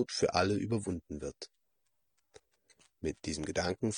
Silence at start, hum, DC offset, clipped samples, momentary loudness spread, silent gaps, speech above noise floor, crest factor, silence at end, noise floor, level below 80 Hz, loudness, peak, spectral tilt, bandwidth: 0 s; none; under 0.1%; under 0.1%; 14 LU; none; 49 dB; 24 dB; 0 s; -83 dBFS; -60 dBFS; -35 LUFS; -12 dBFS; -4.5 dB/octave; 10 kHz